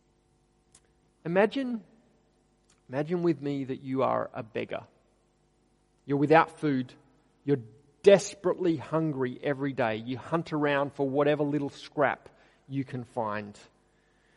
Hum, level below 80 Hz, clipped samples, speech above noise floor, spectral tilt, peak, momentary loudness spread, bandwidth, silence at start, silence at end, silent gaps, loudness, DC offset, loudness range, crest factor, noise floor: 50 Hz at -60 dBFS; -70 dBFS; under 0.1%; 40 dB; -6.5 dB/octave; -6 dBFS; 15 LU; 11.5 kHz; 1.25 s; 0.85 s; none; -29 LUFS; under 0.1%; 6 LU; 24 dB; -68 dBFS